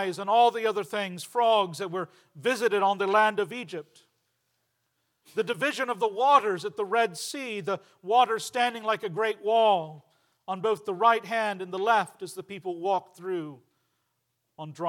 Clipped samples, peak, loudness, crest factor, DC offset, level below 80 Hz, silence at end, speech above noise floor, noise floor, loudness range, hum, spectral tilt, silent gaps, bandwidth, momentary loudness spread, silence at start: under 0.1%; -8 dBFS; -26 LUFS; 20 dB; under 0.1%; under -90 dBFS; 0 s; 51 dB; -78 dBFS; 3 LU; none; -3.5 dB/octave; none; 17.5 kHz; 14 LU; 0 s